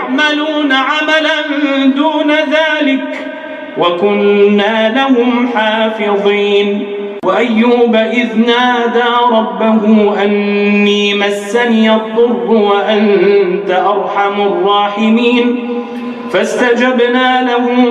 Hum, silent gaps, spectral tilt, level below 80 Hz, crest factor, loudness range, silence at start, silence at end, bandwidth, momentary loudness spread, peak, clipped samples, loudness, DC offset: none; none; -5.5 dB/octave; -62 dBFS; 10 dB; 2 LU; 0 s; 0 s; 10.5 kHz; 5 LU; 0 dBFS; under 0.1%; -11 LUFS; under 0.1%